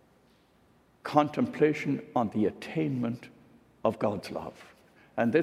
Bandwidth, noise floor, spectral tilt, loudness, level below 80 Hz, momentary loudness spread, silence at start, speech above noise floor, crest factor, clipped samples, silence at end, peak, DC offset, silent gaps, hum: 14 kHz; -64 dBFS; -7.5 dB/octave; -30 LUFS; -70 dBFS; 13 LU; 1.05 s; 34 dB; 22 dB; under 0.1%; 0 s; -8 dBFS; under 0.1%; none; none